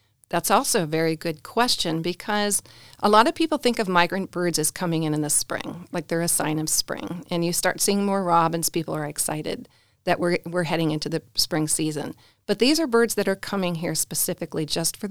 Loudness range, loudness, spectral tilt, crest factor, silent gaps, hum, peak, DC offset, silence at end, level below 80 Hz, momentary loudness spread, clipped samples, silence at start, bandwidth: 3 LU; -23 LUFS; -3.5 dB/octave; 22 dB; none; none; -2 dBFS; 0.6%; 0 s; -54 dBFS; 9 LU; under 0.1%; 0 s; over 20 kHz